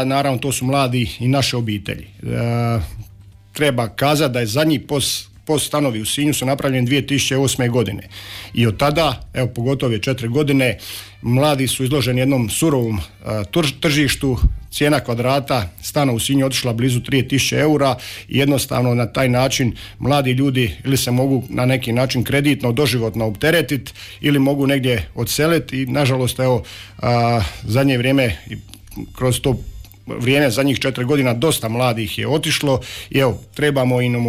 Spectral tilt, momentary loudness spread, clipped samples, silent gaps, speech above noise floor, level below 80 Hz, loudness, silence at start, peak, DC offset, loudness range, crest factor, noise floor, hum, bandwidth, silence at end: -5 dB/octave; 8 LU; under 0.1%; none; 20 dB; -36 dBFS; -18 LUFS; 0 s; -6 dBFS; under 0.1%; 2 LU; 12 dB; -38 dBFS; none; 16 kHz; 0 s